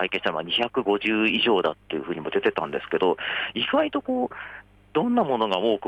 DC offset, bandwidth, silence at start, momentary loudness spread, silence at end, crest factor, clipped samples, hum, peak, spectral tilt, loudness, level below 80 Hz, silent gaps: under 0.1%; 9.2 kHz; 0 s; 8 LU; 0 s; 14 dB; under 0.1%; 50 Hz at -60 dBFS; -10 dBFS; -6 dB/octave; -24 LUFS; -60 dBFS; none